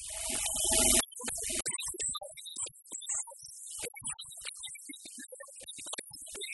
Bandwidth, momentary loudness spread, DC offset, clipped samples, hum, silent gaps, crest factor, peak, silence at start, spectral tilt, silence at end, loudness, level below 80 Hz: 12 kHz; 19 LU; under 0.1%; under 0.1%; none; none; 24 dB; -12 dBFS; 0 s; -0.5 dB/octave; 0 s; -32 LUFS; -54 dBFS